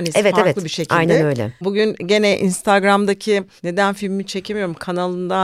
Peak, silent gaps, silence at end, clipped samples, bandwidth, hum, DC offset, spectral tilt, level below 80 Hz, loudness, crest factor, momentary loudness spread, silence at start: 0 dBFS; none; 0 s; under 0.1%; 14.5 kHz; none; under 0.1%; -5 dB/octave; -56 dBFS; -18 LUFS; 16 dB; 9 LU; 0 s